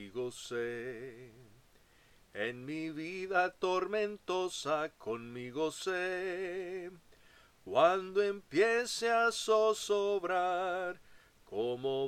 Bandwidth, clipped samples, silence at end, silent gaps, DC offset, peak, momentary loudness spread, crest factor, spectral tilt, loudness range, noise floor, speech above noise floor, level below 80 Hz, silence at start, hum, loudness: 15 kHz; under 0.1%; 0 s; none; under 0.1%; -14 dBFS; 13 LU; 20 dB; -3.5 dB/octave; 7 LU; -65 dBFS; 31 dB; -72 dBFS; 0 s; none; -34 LUFS